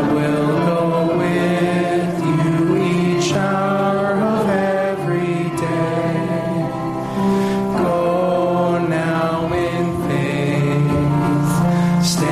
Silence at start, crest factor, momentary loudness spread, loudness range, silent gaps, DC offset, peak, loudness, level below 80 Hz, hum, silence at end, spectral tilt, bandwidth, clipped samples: 0 s; 10 dB; 4 LU; 2 LU; none; under 0.1%; -6 dBFS; -18 LUFS; -44 dBFS; none; 0 s; -6.5 dB/octave; 14.5 kHz; under 0.1%